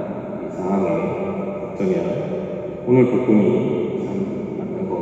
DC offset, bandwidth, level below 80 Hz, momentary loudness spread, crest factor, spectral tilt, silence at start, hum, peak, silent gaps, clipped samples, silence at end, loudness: under 0.1%; 7.8 kHz; -54 dBFS; 11 LU; 18 dB; -9.5 dB/octave; 0 s; none; -4 dBFS; none; under 0.1%; 0 s; -21 LUFS